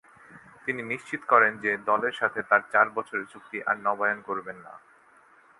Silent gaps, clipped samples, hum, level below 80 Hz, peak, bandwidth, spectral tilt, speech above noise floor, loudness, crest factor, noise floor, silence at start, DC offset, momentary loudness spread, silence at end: none; under 0.1%; none; -74 dBFS; -6 dBFS; 11.5 kHz; -5 dB/octave; 31 dB; -26 LUFS; 22 dB; -57 dBFS; 0.35 s; under 0.1%; 14 LU; 0.8 s